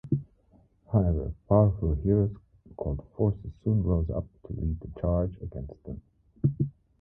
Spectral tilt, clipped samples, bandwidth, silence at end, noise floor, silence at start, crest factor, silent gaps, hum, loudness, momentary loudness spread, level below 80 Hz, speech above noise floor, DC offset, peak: -14.5 dB/octave; under 0.1%; 2 kHz; 0.3 s; -62 dBFS; 0.05 s; 20 dB; none; none; -29 LUFS; 14 LU; -38 dBFS; 35 dB; under 0.1%; -8 dBFS